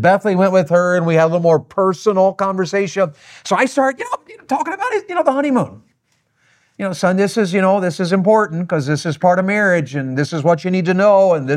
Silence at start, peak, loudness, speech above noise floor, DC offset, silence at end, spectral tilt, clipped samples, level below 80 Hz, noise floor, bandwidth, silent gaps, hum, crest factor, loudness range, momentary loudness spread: 0 s; -2 dBFS; -16 LUFS; 49 dB; under 0.1%; 0 s; -6.5 dB/octave; under 0.1%; -64 dBFS; -64 dBFS; 12.5 kHz; none; none; 14 dB; 4 LU; 7 LU